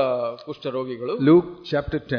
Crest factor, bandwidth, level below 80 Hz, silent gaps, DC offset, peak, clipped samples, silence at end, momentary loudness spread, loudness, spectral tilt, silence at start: 16 dB; 5.4 kHz; -48 dBFS; none; under 0.1%; -6 dBFS; under 0.1%; 0 s; 13 LU; -22 LUFS; -9 dB/octave; 0 s